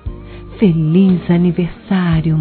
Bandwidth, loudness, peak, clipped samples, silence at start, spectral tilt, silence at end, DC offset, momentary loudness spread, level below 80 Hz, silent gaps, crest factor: 4.5 kHz; -14 LUFS; 0 dBFS; under 0.1%; 0.05 s; -12.5 dB/octave; 0 s; under 0.1%; 18 LU; -34 dBFS; none; 14 dB